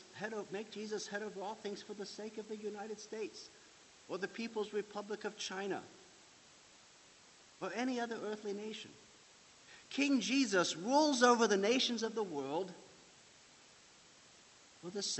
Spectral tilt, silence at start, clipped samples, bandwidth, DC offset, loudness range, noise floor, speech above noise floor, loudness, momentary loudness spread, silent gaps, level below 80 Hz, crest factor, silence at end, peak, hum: -3 dB/octave; 0 s; under 0.1%; 8.2 kHz; under 0.1%; 12 LU; -62 dBFS; 25 dB; -37 LUFS; 16 LU; none; -84 dBFS; 24 dB; 0 s; -14 dBFS; none